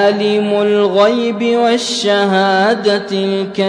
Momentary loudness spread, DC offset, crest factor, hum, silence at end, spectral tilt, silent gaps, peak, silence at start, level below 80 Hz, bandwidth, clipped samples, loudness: 4 LU; under 0.1%; 12 dB; none; 0 s; -4.5 dB/octave; none; -2 dBFS; 0 s; -60 dBFS; 10.5 kHz; under 0.1%; -13 LUFS